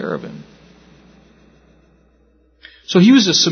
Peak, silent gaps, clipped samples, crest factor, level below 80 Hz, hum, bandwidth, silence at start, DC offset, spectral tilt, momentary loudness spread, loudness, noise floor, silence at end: 0 dBFS; none; under 0.1%; 18 dB; -56 dBFS; none; 6.6 kHz; 0 s; under 0.1%; -4.5 dB/octave; 28 LU; -13 LUFS; -55 dBFS; 0 s